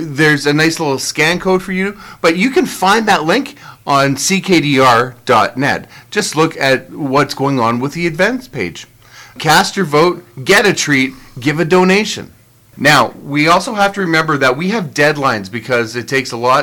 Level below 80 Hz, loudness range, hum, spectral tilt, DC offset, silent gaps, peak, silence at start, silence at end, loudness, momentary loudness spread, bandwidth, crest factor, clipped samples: -48 dBFS; 3 LU; none; -4 dB/octave; under 0.1%; none; 0 dBFS; 0 s; 0 s; -13 LUFS; 9 LU; 19 kHz; 14 dB; under 0.1%